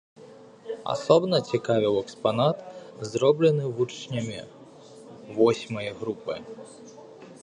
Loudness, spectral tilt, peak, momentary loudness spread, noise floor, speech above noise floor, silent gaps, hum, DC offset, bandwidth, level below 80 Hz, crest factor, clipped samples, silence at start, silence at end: -26 LUFS; -6 dB/octave; -4 dBFS; 24 LU; -48 dBFS; 23 dB; none; none; under 0.1%; 10.5 kHz; -66 dBFS; 24 dB; under 0.1%; 0.2 s; 0.05 s